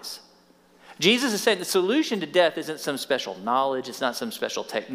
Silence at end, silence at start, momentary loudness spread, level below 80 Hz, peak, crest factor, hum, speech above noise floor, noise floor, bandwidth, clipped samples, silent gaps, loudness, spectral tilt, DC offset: 0 s; 0 s; 9 LU; -76 dBFS; -6 dBFS; 20 dB; none; 33 dB; -57 dBFS; 16 kHz; under 0.1%; none; -24 LUFS; -3 dB/octave; under 0.1%